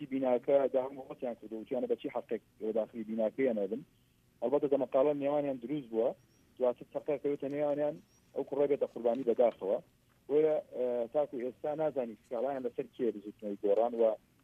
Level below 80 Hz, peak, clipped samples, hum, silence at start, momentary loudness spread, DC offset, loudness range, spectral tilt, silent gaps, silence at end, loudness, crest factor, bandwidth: -76 dBFS; -16 dBFS; under 0.1%; none; 0 s; 11 LU; under 0.1%; 3 LU; -8 dB/octave; none; 0.25 s; -34 LUFS; 18 dB; 6 kHz